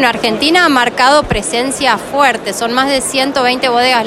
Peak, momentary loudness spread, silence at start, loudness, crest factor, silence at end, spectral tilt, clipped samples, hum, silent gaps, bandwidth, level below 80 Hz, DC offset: 0 dBFS; 6 LU; 0 s; -11 LUFS; 12 dB; 0 s; -2.5 dB/octave; under 0.1%; none; none; 16.5 kHz; -36 dBFS; under 0.1%